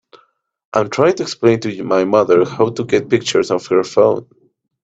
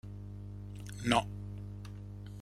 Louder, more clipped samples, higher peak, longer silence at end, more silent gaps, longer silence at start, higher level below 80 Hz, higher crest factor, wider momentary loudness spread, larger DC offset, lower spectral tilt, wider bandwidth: first, -15 LUFS vs -38 LUFS; neither; first, 0 dBFS vs -12 dBFS; first, 0.6 s vs 0 s; neither; first, 0.75 s vs 0.05 s; about the same, -56 dBFS vs -52 dBFS; second, 16 dB vs 26 dB; second, 6 LU vs 16 LU; neither; about the same, -5.5 dB/octave vs -5 dB/octave; second, 8 kHz vs 14 kHz